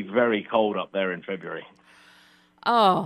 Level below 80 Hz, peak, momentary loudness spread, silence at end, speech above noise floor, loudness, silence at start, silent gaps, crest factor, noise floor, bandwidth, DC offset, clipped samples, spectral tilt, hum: -74 dBFS; -6 dBFS; 14 LU; 0 s; 33 dB; -25 LUFS; 0 s; none; 18 dB; -57 dBFS; 12.5 kHz; under 0.1%; under 0.1%; -6 dB/octave; none